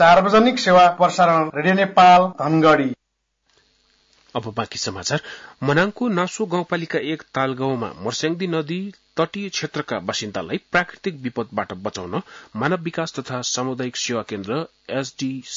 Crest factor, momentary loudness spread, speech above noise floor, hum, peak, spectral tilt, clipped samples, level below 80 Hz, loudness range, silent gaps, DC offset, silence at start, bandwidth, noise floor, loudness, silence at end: 16 dB; 15 LU; 50 dB; none; -4 dBFS; -4.5 dB/octave; under 0.1%; -58 dBFS; 9 LU; none; under 0.1%; 0 s; 7.8 kHz; -70 dBFS; -20 LUFS; 0 s